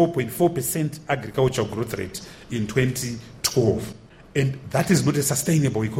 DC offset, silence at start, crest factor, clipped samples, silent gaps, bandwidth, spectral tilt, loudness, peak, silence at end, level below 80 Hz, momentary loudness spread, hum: under 0.1%; 0 s; 18 dB; under 0.1%; none; 16.5 kHz; -5 dB/octave; -23 LUFS; -6 dBFS; 0 s; -50 dBFS; 10 LU; none